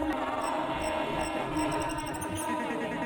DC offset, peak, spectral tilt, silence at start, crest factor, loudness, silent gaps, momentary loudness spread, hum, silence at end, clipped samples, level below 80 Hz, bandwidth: under 0.1%; -18 dBFS; -4.5 dB/octave; 0 s; 14 dB; -32 LUFS; none; 3 LU; none; 0 s; under 0.1%; -50 dBFS; 19 kHz